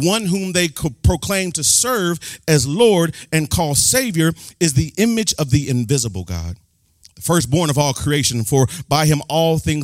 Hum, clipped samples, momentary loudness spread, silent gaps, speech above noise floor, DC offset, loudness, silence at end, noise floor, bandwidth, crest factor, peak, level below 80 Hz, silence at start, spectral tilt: none; under 0.1%; 7 LU; none; 35 dB; under 0.1%; -17 LUFS; 0 s; -52 dBFS; 16.5 kHz; 16 dB; -2 dBFS; -38 dBFS; 0 s; -4 dB/octave